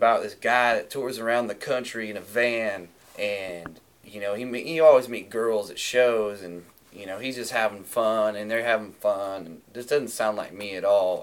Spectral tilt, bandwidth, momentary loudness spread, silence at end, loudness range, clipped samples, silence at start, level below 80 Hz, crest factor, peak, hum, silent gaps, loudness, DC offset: -3.5 dB/octave; 18 kHz; 16 LU; 0 s; 4 LU; under 0.1%; 0 s; -68 dBFS; 20 dB; -6 dBFS; none; none; -25 LUFS; under 0.1%